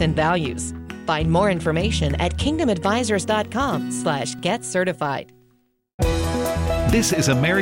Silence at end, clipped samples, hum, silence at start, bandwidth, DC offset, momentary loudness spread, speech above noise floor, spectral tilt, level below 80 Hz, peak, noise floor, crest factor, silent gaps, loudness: 0 s; under 0.1%; none; 0 s; 16.5 kHz; under 0.1%; 7 LU; 41 dB; -5 dB/octave; -32 dBFS; -6 dBFS; -62 dBFS; 14 dB; 5.94-5.98 s; -22 LUFS